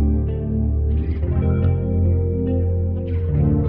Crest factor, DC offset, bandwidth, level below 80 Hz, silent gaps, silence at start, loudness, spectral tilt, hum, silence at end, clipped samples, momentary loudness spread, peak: 14 dB; under 0.1%; 3 kHz; -24 dBFS; none; 0 s; -21 LUFS; -13.5 dB/octave; none; 0 s; under 0.1%; 4 LU; -6 dBFS